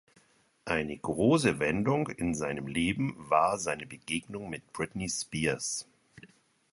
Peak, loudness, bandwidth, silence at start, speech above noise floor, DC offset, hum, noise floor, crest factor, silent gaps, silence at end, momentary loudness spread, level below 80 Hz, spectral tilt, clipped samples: -10 dBFS; -31 LUFS; 11.5 kHz; 0.65 s; 35 dB; under 0.1%; none; -66 dBFS; 22 dB; none; 0.45 s; 11 LU; -56 dBFS; -4.5 dB/octave; under 0.1%